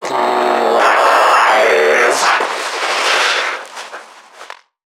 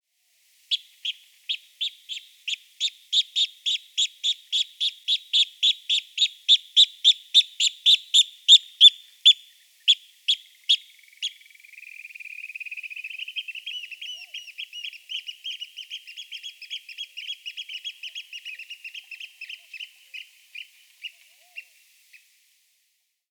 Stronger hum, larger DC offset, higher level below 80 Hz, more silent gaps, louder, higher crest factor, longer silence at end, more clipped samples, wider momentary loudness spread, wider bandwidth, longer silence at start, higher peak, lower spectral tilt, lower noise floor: neither; neither; first, -72 dBFS vs under -90 dBFS; neither; first, -12 LUFS vs -20 LUFS; second, 14 dB vs 24 dB; second, 0.5 s vs 1.7 s; neither; second, 16 LU vs 23 LU; about the same, 19 kHz vs 20 kHz; second, 0 s vs 0.7 s; first, 0 dBFS vs -4 dBFS; first, -0.5 dB/octave vs 11.5 dB/octave; second, -37 dBFS vs -72 dBFS